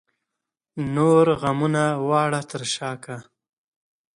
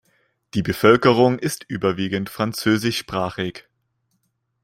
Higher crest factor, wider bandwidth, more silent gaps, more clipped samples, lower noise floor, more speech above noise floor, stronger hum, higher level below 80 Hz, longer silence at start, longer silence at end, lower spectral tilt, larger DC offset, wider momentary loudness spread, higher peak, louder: about the same, 18 dB vs 20 dB; second, 11 kHz vs 16 kHz; neither; neither; first, -85 dBFS vs -71 dBFS; first, 63 dB vs 51 dB; neither; about the same, -58 dBFS vs -54 dBFS; first, 0.75 s vs 0.55 s; about the same, 0.95 s vs 1.05 s; about the same, -5.5 dB/octave vs -5.5 dB/octave; neither; first, 18 LU vs 11 LU; second, -6 dBFS vs -2 dBFS; about the same, -21 LUFS vs -20 LUFS